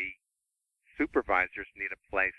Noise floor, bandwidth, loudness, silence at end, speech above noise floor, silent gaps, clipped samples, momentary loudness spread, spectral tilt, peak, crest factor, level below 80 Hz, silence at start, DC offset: -84 dBFS; 11 kHz; -31 LUFS; 0.05 s; 53 dB; none; under 0.1%; 10 LU; -6.5 dB/octave; -10 dBFS; 22 dB; -58 dBFS; 0 s; under 0.1%